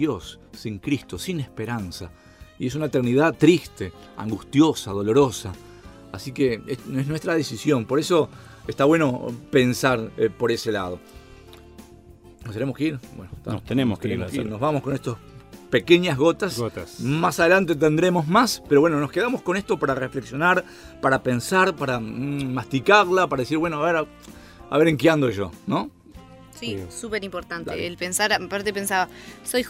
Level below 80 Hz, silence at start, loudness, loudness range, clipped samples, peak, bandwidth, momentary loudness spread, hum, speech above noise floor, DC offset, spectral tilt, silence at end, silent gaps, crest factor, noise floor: -52 dBFS; 0 s; -22 LUFS; 7 LU; under 0.1%; -2 dBFS; 16 kHz; 16 LU; none; 25 dB; under 0.1%; -5.5 dB/octave; 0 s; none; 20 dB; -47 dBFS